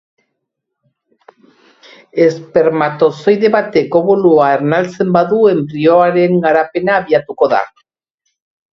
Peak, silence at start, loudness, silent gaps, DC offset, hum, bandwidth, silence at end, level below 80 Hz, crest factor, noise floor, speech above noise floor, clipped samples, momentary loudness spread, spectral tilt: 0 dBFS; 2.15 s; -12 LUFS; none; under 0.1%; none; 7.2 kHz; 1.05 s; -56 dBFS; 14 dB; -75 dBFS; 63 dB; under 0.1%; 5 LU; -7.5 dB/octave